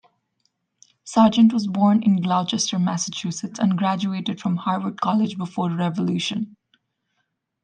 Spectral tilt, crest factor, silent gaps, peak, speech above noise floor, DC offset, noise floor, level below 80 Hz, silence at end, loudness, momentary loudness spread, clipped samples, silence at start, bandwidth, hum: -5.5 dB/octave; 18 dB; none; -4 dBFS; 54 dB; under 0.1%; -74 dBFS; -66 dBFS; 1.15 s; -21 LUFS; 9 LU; under 0.1%; 1.05 s; 9.6 kHz; none